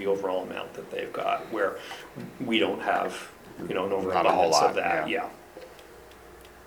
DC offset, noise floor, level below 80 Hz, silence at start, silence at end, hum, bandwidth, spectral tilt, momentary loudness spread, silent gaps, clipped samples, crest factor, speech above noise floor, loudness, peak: under 0.1%; -49 dBFS; -62 dBFS; 0 s; 0 s; none; over 20 kHz; -3.5 dB/octave; 22 LU; none; under 0.1%; 20 dB; 21 dB; -27 LUFS; -8 dBFS